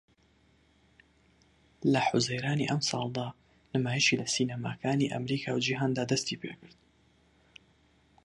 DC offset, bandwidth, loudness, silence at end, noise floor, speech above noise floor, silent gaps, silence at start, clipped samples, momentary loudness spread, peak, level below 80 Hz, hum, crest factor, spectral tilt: under 0.1%; 11.5 kHz; -30 LUFS; 1.6 s; -66 dBFS; 36 dB; none; 1.8 s; under 0.1%; 10 LU; -12 dBFS; -68 dBFS; none; 22 dB; -4.5 dB/octave